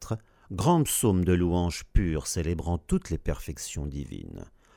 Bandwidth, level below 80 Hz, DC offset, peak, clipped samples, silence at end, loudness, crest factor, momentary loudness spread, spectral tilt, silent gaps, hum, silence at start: 18.5 kHz; -36 dBFS; under 0.1%; -8 dBFS; under 0.1%; 0.3 s; -28 LUFS; 20 dB; 15 LU; -5.5 dB/octave; none; none; 0 s